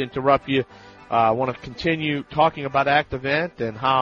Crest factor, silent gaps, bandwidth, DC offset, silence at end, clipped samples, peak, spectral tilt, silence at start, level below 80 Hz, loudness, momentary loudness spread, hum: 18 dB; none; 7.2 kHz; under 0.1%; 0 s; under 0.1%; -4 dBFS; -7 dB/octave; 0 s; -50 dBFS; -22 LUFS; 7 LU; none